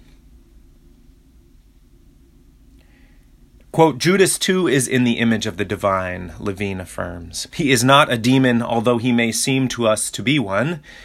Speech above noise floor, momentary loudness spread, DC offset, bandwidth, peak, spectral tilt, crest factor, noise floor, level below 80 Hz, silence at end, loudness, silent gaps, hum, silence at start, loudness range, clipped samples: 32 dB; 13 LU; under 0.1%; 16 kHz; 0 dBFS; -4.5 dB/octave; 20 dB; -50 dBFS; -48 dBFS; 0 s; -18 LUFS; none; none; 3.75 s; 4 LU; under 0.1%